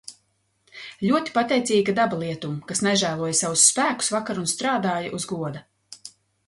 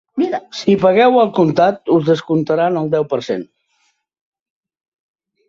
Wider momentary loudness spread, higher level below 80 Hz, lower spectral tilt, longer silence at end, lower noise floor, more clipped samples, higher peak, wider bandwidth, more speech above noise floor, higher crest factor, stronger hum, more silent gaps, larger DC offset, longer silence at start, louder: first, 24 LU vs 9 LU; second, -64 dBFS vs -58 dBFS; second, -3 dB/octave vs -7 dB/octave; second, 0.4 s vs 2.05 s; first, -69 dBFS vs -64 dBFS; neither; about the same, -2 dBFS vs -2 dBFS; first, 11.5 kHz vs 7.6 kHz; about the same, 46 dB vs 49 dB; first, 22 dB vs 14 dB; neither; neither; neither; about the same, 0.1 s vs 0.15 s; second, -22 LUFS vs -15 LUFS